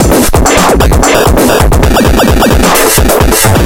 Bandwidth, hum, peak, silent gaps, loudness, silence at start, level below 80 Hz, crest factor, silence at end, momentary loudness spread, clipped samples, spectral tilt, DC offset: over 20 kHz; none; 0 dBFS; none; -6 LUFS; 0 s; -12 dBFS; 6 dB; 0 s; 1 LU; 1%; -4.5 dB/octave; under 0.1%